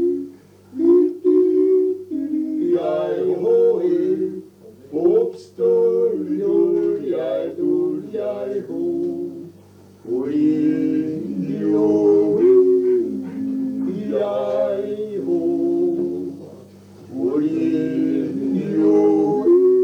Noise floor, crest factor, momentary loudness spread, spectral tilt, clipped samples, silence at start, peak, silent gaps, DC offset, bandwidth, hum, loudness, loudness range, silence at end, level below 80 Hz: -46 dBFS; 14 dB; 10 LU; -9 dB/octave; under 0.1%; 0 s; -6 dBFS; none; under 0.1%; 6.6 kHz; none; -19 LUFS; 5 LU; 0 s; -68 dBFS